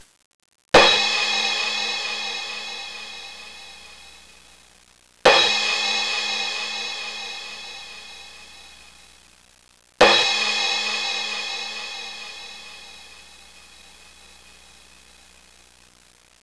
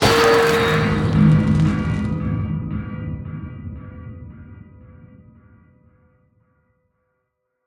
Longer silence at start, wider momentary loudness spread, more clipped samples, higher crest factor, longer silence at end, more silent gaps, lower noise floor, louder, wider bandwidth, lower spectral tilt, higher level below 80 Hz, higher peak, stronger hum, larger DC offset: first, 0.75 s vs 0 s; about the same, 25 LU vs 23 LU; neither; about the same, 20 dB vs 20 dB; first, 2.85 s vs 2.6 s; neither; second, -54 dBFS vs -74 dBFS; about the same, -20 LUFS vs -18 LUFS; second, 11 kHz vs 19 kHz; second, -1 dB/octave vs -6 dB/octave; second, -54 dBFS vs -38 dBFS; second, -6 dBFS vs 0 dBFS; neither; first, 0.3% vs under 0.1%